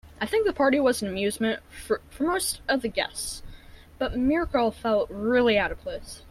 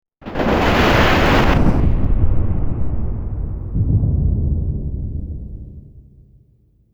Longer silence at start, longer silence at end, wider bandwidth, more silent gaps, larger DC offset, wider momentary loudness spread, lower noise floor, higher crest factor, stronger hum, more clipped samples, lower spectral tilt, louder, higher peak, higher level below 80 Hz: second, 0.05 s vs 0.2 s; second, 0 s vs 0.95 s; about the same, 15.5 kHz vs 16.5 kHz; neither; neither; second, 12 LU vs 16 LU; second, -47 dBFS vs -55 dBFS; about the same, 16 dB vs 14 dB; neither; neither; second, -3.5 dB/octave vs -6.5 dB/octave; second, -26 LUFS vs -18 LUFS; second, -10 dBFS vs -2 dBFS; second, -46 dBFS vs -22 dBFS